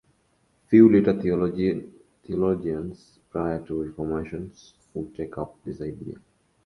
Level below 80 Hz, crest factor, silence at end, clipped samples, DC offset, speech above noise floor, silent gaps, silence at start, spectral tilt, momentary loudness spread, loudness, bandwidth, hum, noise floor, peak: -50 dBFS; 22 dB; 0.5 s; under 0.1%; under 0.1%; 43 dB; none; 0.7 s; -9.5 dB/octave; 21 LU; -24 LUFS; 6.2 kHz; none; -66 dBFS; -4 dBFS